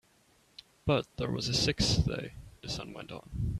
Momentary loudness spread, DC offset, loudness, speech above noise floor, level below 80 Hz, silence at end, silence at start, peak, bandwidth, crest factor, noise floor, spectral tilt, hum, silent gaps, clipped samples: 16 LU; under 0.1%; -31 LUFS; 35 dB; -44 dBFS; 0 s; 0.85 s; -14 dBFS; 13.5 kHz; 20 dB; -66 dBFS; -4.5 dB/octave; none; none; under 0.1%